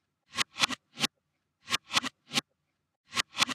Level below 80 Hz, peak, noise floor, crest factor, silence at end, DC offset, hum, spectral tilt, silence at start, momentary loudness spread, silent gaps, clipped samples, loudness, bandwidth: -72 dBFS; -6 dBFS; -80 dBFS; 28 dB; 0 s; under 0.1%; none; -0.5 dB/octave; 0.35 s; 5 LU; 2.96-3.04 s; under 0.1%; -31 LUFS; 16 kHz